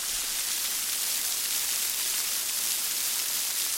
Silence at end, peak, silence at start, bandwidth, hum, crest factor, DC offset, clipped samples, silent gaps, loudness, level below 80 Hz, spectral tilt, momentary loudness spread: 0 s; -10 dBFS; 0 s; 17 kHz; none; 20 dB; under 0.1%; under 0.1%; none; -26 LUFS; -62 dBFS; 3 dB/octave; 1 LU